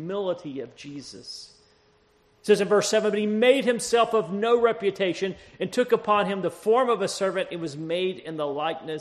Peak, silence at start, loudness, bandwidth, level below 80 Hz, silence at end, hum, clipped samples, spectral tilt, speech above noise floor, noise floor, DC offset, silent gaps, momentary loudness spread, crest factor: -6 dBFS; 0 s; -24 LUFS; 13 kHz; -66 dBFS; 0 s; none; under 0.1%; -4 dB/octave; 37 dB; -62 dBFS; under 0.1%; none; 17 LU; 18 dB